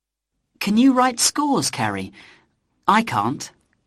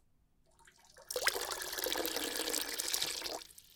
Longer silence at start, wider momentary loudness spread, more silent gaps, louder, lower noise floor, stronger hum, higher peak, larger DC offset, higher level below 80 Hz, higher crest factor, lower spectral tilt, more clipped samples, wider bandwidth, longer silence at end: about the same, 0.6 s vs 0.6 s; first, 15 LU vs 7 LU; neither; first, -19 LUFS vs -36 LUFS; first, -78 dBFS vs -70 dBFS; neither; first, -2 dBFS vs -12 dBFS; neither; first, -60 dBFS vs -66 dBFS; second, 20 dB vs 26 dB; first, -3.5 dB/octave vs 0.5 dB/octave; neither; second, 14.5 kHz vs 19 kHz; first, 0.35 s vs 0 s